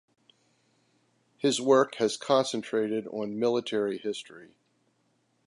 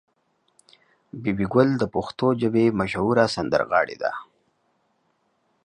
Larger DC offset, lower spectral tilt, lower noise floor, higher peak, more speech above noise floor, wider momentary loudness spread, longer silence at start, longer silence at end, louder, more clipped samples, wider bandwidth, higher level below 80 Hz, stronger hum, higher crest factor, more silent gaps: neither; second, -4 dB/octave vs -7 dB/octave; about the same, -72 dBFS vs -69 dBFS; second, -10 dBFS vs -4 dBFS; about the same, 44 dB vs 47 dB; first, 12 LU vs 9 LU; first, 1.45 s vs 1.15 s; second, 1 s vs 1.4 s; second, -28 LUFS vs -22 LUFS; neither; about the same, 11.5 kHz vs 10.5 kHz; second, -80 dBFS vs -54 dBFS; neither; about the same, 20 dB vs 20 dB; neither